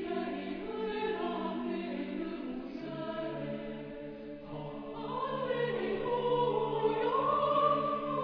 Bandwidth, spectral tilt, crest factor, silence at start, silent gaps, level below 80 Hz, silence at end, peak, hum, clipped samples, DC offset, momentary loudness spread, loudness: 5.4 kHz; -8.5 dB/octave; 18 dB; 0 s; none; -60 dBFS; 0 s; -16 dBFS; none; under 0.1%; under 0.1%; 13 LU; -34 LUFS